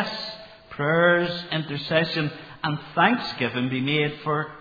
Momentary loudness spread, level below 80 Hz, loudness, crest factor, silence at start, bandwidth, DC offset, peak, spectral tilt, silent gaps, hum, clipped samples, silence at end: 11 LU; -60 dBFS; -24 LUFS; 20 dB; 0 s; 5 kHz; under 0.1%; -4 dBFS; -7 dB/octave; none; none; under 0.1%; 0 s